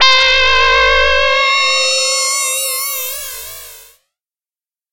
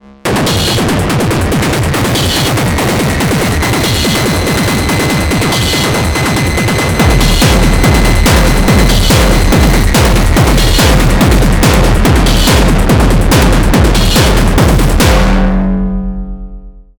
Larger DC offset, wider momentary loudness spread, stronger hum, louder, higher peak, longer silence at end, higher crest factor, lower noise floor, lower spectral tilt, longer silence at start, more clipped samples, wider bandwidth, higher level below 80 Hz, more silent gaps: neither; first, 15 LU vs 3 LU; neither; about the same, -11 LUFS vs -9 LUFS; about the same, -2 dBFS vs 0 dBFS; first, 1.1 s vs 0.2 s; about the same, 12 dB vs 8 dB; first, under -90 dBFS vs -29 dBFS; second, 2 dB/octave vs -4.5 dB/octave; second, 0 s vs 0.25 s; neither; second, 17 kHz vs over 20 kHz; second, -36 dBFS vs -12 dBFS; neither